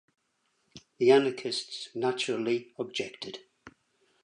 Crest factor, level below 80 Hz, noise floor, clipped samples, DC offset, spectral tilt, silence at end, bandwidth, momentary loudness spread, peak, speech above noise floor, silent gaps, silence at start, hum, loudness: 22 dB; -78 dBFS; -75 dBFS; under 0.1%; under 0.1%; -4 dB/octave; 0.55 s; 10.5 kHz; 17 LU; -10 dBFS; 47 dB; none; 0.75 s; none; -29 LUFS